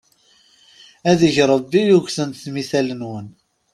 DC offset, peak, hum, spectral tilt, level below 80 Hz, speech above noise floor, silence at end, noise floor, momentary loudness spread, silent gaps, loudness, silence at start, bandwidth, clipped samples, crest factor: under 0.1%; -2 dBFS; none; -5.5 dB/octave; -56 dBFS; 39 dB; 0.45 s; -56 dBFS; 14 LU; none; -18 LUFS; 1.05 s; 13 kHz; under 0.1%; 18 dB